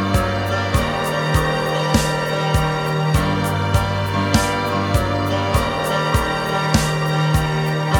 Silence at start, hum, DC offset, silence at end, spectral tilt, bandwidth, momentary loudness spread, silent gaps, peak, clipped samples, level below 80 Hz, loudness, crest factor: 0 s; none; under 0.1%; 0 s; -5.5 dB/octave; 19 kHz; 2 LU; none; 0 dBFS; under 0.1%; -30 dBFS; -19 LUFS; 18 dB